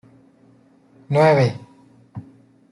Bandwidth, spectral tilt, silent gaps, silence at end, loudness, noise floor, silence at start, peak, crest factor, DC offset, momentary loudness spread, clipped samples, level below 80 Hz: 11.5 kHz; -7.5 dB/octave; none; 0.5 s; -17 LUFS; -54 dBFS; 1.1 s; -4 dBFS; 20 dB; under 0.1%; 24 LU; under 0.1%; -62 dBFS